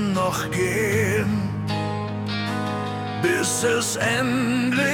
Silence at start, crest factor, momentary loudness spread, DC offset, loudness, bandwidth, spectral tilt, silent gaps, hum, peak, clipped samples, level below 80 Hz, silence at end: 0 s; 14 dB; 6 LU; under 0.1%; -23 LUFS; 18 kHz; -4.5 dB/octave; none; none; -8 dBFS; under 0.1%; -52 dBFS; 0 s